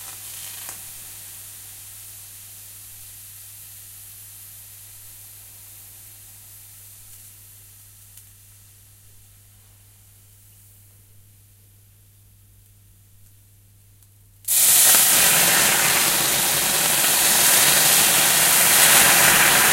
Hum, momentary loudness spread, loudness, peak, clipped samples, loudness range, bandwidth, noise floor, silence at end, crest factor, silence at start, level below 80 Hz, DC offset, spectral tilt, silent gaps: none; 27 LU; -14 LUFS; 0 dBFS; under 0.1%; 26 LU; 16 kHz; -52 dBFS; 0 s; 22 dB; 0 s; -56 dBFS; under 0.1%; 0.5 dB/octave; none